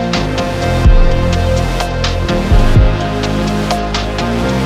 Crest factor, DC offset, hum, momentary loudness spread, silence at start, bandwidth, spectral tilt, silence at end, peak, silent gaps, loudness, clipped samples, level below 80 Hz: 12 dB; under 0.1%; none; 5 LU; 0 s; 13.5 kHz; -6 dB/octave; 0 s; 0 dBFS; none; -14 LUFS; under 0.1%; -14 dBFS